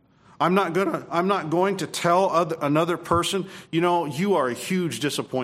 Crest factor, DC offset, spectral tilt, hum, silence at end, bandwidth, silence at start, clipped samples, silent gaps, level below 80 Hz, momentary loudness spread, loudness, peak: 18 dB; under 0.1%; -5 dB/octave; none; 0 s; 16 kHz; 0.4 s; under 0.1%; none; -56 dBFS; 5 LU; -23 LUFS; -6 dBFS